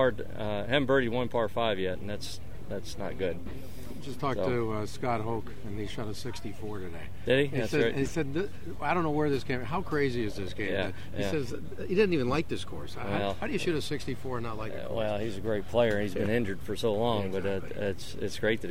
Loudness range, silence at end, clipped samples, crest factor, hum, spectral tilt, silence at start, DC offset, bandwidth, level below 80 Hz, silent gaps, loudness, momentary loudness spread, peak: 4 LU; 0 s; under 0.1%; 18 dB; none; -6 dB/octave; 0 s; 2%; 16 kHz; -50 dBFS; none; -31 LUFS; 12 LU; -12 dBFS